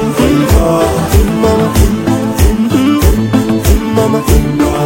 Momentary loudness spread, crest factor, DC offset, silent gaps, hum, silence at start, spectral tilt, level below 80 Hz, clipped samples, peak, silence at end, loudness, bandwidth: 2 LU; 10 dB; under 0.1%; none; none; 0 s; -6 dB/octave; -16 dBFS; 0.2%; 0 dBFS; 0 s; -11 LUFS; 17 kHz